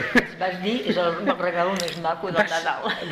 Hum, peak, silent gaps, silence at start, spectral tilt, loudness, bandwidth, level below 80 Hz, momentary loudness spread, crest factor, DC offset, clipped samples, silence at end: none; -6 dBFS; none; 0 s; -4.5 dB/octave; -24 LUFS; 16 kHz; -54 dBFS; 5 LU; 18 dB; under 0.1%; under 0.1%; 0 s